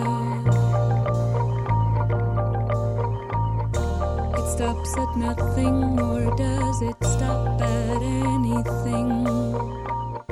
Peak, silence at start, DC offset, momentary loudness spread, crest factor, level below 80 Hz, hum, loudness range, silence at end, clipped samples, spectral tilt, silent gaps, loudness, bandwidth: -10 dBFS; 0 s; under 0.1%; 4 LU; 12 dB; -32 dBFS; none; 2 LU; 0.1 s; under 0.1%; -7 dB/octave; none; -24 LUFS; 12.5 kHz